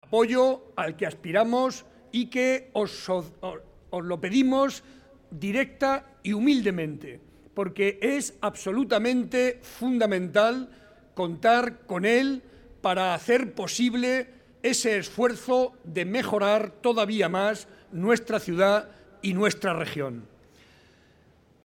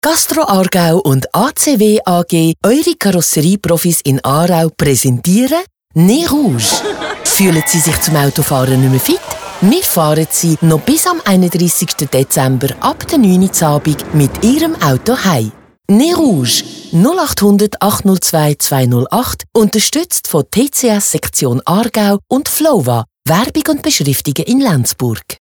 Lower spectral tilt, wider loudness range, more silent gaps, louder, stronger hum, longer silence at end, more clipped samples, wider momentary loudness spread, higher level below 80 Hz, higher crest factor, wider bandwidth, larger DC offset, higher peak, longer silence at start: about the same, -4.5 dB/octave vs -4.5 dB/octave; about the same, 3 LU vs 1 LU; neither; second, -26 LUFS vs -11 LUFS; neither; first, 1.4 s vs 0.05 s; neither; first, 12 LU vs 4 LU; second, -62 dBFS vs -40 dBFS; first, 18 dB vs 12 dB; second, 16.5 kHz vs over 20 kHz; neither; second, -8 dBFS vs 0 dBFS; about the same, 0.1 s vs 0.05 s